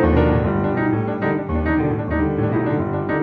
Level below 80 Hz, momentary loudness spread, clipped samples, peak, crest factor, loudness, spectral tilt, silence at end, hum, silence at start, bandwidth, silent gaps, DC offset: -30 dBFS; 4 LU; under 0.1%; -4 dBFS; 16 dB; -20 LUFS; -10.5 dB/octave; 0 s; none; 0 s; 4.9 kHz; none; under 0.1%